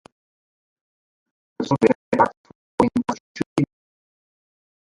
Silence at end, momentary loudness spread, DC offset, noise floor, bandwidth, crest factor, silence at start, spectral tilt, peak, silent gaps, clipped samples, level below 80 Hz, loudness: 1.2 s; 10 LU; under 0.1%; under -90 dBFS; 11.5 kHz; 24 dB; 1.6 s; -7 dB/octave; 0 dBFS; 1.95-2.12 s, 2.37-2.44 s, 2.55-2.78 s, 3.20-3.35 s, 3.46-3.56 s; under 0.1%; -56 dBFS; -22 LUFS